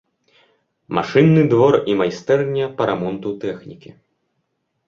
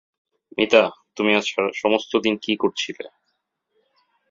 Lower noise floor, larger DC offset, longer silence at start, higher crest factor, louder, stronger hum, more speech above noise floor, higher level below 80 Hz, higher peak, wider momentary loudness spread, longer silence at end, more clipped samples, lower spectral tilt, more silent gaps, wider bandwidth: about the same, -71 dBFS vs -74 dBFS; neither; first, 0.9 s vs 0.55 s; about the same, 18 dB vs 22 dB; first, -17 LUFS vs -21 LUFS; neither; about the same, 54 dB vs 54 dB; first, -56 dBFS vs -66 dBFS; about the same, 0 dBFS vs -2 dBFS; about the same, 13 LU vs 13 LU; second, 1.1 s vs 1.25 s; neither; first, -8 dB/octave vs -4 dB/octave; neither; about the same, 7.2 kHz vs 7.6 kHz